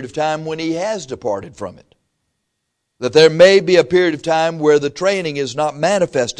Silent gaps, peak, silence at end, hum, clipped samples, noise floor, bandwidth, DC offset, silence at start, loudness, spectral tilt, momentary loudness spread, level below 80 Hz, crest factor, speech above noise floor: none; 0 dBFS; 0.05 s; none; under 0.1%; -73 dBFS; 10.5 kHz; under 0.1%; 0 s; -15 LUFS; -4.5 dB/octave; 14 LU; -56 dBFS; 16 dB; 58 dB